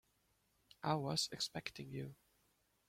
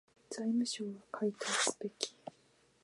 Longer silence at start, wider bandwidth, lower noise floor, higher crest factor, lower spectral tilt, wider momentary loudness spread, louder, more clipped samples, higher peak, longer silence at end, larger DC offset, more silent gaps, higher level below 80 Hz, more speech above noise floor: first, 0.85 s vs 0.3 s; first, 16.5 kHz vs 11.5 kHz; first, -79 dBFS vs -69 dBFS; about the same, 24 dB vs 26 dB; first, -4 dB/octave vs -2.5 dB/octave; second, 11 LU vs 14 LU; second, -42 LUFS vs -37 LUFS; neither; second, -22 dBFS vs -12 dBFS; first, 0.75 s vs 0.55 s; neither; neither; first, -74 dBFS vs -86 dBFS; first, 37 dB vs 33 dB